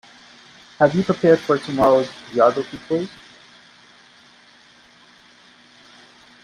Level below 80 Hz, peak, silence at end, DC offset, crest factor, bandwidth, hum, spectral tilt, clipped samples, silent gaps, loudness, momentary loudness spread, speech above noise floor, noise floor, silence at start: -58 dBFS; -2 dBFS; 3.35 s; under 0.1%; 20 dB; 11.5 kHz; none; -6.5 dB/octave; under 0.1%; none; -19 LUFS; 9 LU; 33 dB; -51 dBFS; 0.8 s